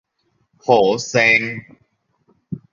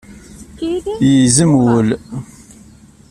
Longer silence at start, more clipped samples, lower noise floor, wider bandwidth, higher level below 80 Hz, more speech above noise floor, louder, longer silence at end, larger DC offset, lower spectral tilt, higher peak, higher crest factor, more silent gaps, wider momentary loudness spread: first, 0.65 s vs 0.1 s; neither; first, -66 dBFS vs -42 dBFS; second, 7.6 kHz vs 13 kHz; second, -58 dBFS vs -42 dBFS; first, 50 dB vs 30 dB; second, -16 LUFS vs -13 LUFS; second, 0.15 s vs 0.85 s; neither; second, -4 dB/octave vs -5.5 dB/octave; about the same, 0 dBFS vs 0 dBFS; about the same, 20 dB vs 16 dB; neither; first, 20 LU vs 16 LU